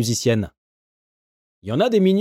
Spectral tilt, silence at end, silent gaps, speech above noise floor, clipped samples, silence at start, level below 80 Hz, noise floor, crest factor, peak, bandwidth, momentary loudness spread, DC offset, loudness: -5.5 dB/octave; 0 s; 0.57-1.62 s; over 71 dB; under 0.1%; 0 s; -54 dBFS; under -90 dBFS; 14 dB; -6 dBFS; 15.5 kHz; 16 LU; under 0.1%; -20 LUFS